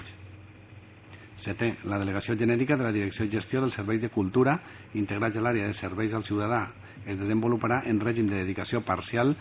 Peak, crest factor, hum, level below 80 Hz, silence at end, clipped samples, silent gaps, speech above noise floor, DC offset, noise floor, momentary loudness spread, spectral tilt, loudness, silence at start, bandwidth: -10 dBFS; 18 dB; none; -52 dBFS; 0 s; under 0.1%; none; 22 dB; under 0.1%; -49 dBFS; 12 LU; -6.5 dB/octave; -28 LUFS; 0 s; 4 kHz